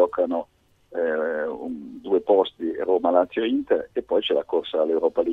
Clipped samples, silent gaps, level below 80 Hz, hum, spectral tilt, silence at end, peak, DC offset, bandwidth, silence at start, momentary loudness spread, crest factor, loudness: under 0.1%; none; -62 dBFS; none; -6.5 dB/octave; 0 s; -4 dBFS; under 0.1%; 4.2 kHz; 0 s; 11 LU; 18 dB; -23 LUFS